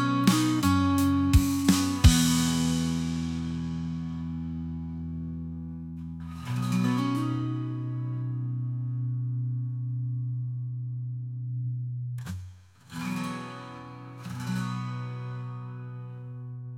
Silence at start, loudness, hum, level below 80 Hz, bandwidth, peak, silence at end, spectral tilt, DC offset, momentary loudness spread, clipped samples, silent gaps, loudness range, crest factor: 0 s; -29 LUFS; none; -40 dBFS; 17 kHz; -6 dBFS; 0 s; -5.5 dB/octave; under 0.1%; 16 LU; under 0.1%; none; 11 LU; 22 dB